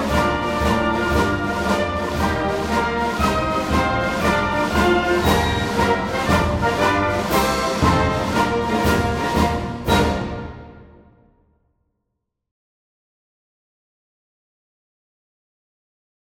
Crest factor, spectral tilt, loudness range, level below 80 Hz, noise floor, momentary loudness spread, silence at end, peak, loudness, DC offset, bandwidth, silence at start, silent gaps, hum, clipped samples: 18 dB; -5.5 dB/octave; 6 LU; -32 dBFS; -77 dBFS; 4 LU; 5.55 s; -4 dBFS; -19 LUFS; under 0.1%; 16.5 kHz; 0 s; none; none; under 0.1%